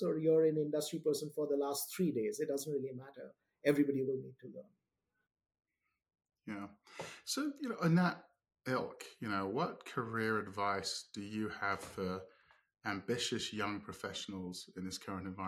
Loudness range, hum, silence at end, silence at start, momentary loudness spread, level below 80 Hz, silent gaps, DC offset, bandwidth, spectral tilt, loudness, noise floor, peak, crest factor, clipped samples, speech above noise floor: 4 LU; none; 0 s; 0 s; 16 LU; -76 dBFS; none; under 0.1%; 17.5 kHz; -5 dB/octave; -38 LUFS; -70 dBFS; -16 dBFS; 22 dB; under 0.1%; 33 dB